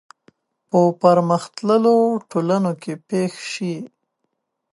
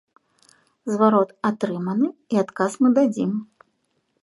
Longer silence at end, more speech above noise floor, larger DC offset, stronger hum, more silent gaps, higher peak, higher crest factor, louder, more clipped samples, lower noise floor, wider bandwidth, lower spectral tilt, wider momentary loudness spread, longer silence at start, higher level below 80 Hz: about the same, 0.85 s vs 0.8 s; first, 56 dB vs 50 dB; neither; neither; neither; about the same, -2 dBFS vs -2 dBFS; about the same, 18 dB vs 20 dB; first, -19 LUFS vs -22 LUFS; neither; first, -75 dBFS vs -70 dBFS; about the same, 11.5 kHz vs 11.5 kHz; about the same, -7 dB/octave vs -7 dB/octave; first, 12 LU vs 9 LU; about the same, 0.75 s vs 0.85 s; about the same, -72 dBFS vs -74 dBFS